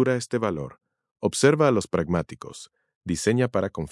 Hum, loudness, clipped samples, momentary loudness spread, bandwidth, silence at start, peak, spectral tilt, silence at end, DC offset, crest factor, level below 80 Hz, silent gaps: none; -24 LUFS; under 0.1%; 19 LU; 12 kHz; 0 s; -4 dBFS; -5.5 dB/octave; 0.05 s; under 0.1%; 20 dB; -56 dBFS; 1.11-1.16 s, 2.96-3.01 s